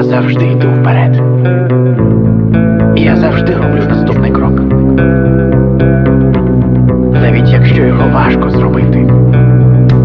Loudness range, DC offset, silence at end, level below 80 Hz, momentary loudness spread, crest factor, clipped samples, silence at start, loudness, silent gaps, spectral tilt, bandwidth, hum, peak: 1 LU; under 0.1%; 0 s; -22 dBFS; 3 LU; 6 dB; under 0.1%; 0 s; -8 LUFS; none; -11 dB/octave; 5 kHz; none; 0 dBFS